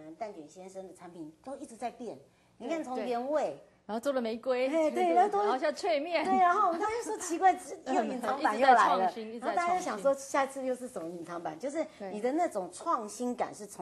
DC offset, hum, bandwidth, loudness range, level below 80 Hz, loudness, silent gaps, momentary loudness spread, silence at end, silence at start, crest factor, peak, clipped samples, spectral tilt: under 0.1%; none; 12.5 kHz; 9 LU; -74 dBFS; -31 LUFS; none; 19 LU; 0 s; 0 s; 20 dB; -10 dBFS; under 0.1%; -3.5 dB/octave